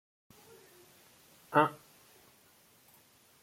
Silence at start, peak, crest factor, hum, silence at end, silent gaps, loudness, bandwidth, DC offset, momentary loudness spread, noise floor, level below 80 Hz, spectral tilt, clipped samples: 1.5 s; -10 dBFS; 28 dB; none; 1.7 s; none; -30 LUFS; 16.5 kHz; under 0.1%; 28 LU; -64 dBFS; -80 dBFS; -5.5 dB/octave; under 0.1%